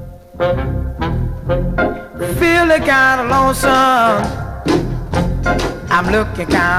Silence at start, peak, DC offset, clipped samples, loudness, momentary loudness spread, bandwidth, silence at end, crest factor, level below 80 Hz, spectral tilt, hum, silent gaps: 0 s; -2 dBFS; under 0.1%; under 0.1%; -15 LUFS; 10 LU; 17 kHz; 0 s; 12 dB; -26 dBFS; -5.5 dB/octave; none; none